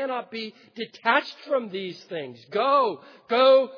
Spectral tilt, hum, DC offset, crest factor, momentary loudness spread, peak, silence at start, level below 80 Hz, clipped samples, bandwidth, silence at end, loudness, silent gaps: -5 dB/octave; none; under 0.1%; 18 dB; 17 LU; -6 dBFS; 0 s; under -90 dBFS; under 0.1%; 5.4 kHz; 0 s; -24 LUFS; none